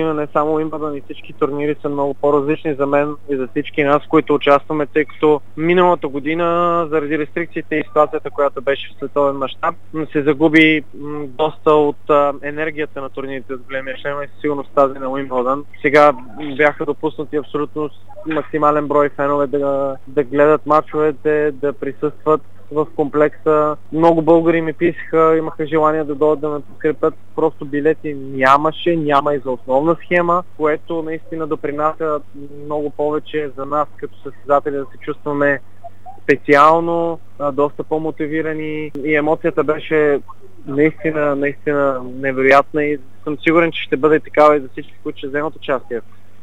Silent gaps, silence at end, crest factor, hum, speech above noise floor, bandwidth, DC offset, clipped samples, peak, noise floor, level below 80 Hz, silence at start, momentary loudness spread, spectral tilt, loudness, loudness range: none; 0.45 s; 18 dB; none; 21 dB; 8.2 kHz; 3%; under 0.1%; 0 dBFS; -38 dBFS; -62 dBFS; 0 s; 12 LU; -7 dB/octave; -17 LUFS; 5 LU